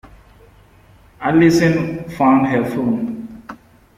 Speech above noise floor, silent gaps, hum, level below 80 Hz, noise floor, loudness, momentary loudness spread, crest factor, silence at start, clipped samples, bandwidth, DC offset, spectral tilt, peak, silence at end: 33 dB; none; none; -48 dBFS; -48 dBFS; -16 LUFS; 20 LU; 16 dB; 0.05 s; under 0.1%; 15.5 kHz; under 0.1%; -7 dB/octave; -2 dBFS; 0.45 s